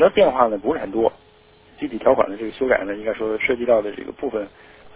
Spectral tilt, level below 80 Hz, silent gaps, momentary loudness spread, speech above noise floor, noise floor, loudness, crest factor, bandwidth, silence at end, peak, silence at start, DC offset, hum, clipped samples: -9 dB/octave; -50 dBFS; none; 13 LU; 31 dB; -51 dBFS; -21 LUFS; 20 dB; 4 kHz; 0.05 s; -2 dBFS; 0 s; under 0.1%; none; under 0.1%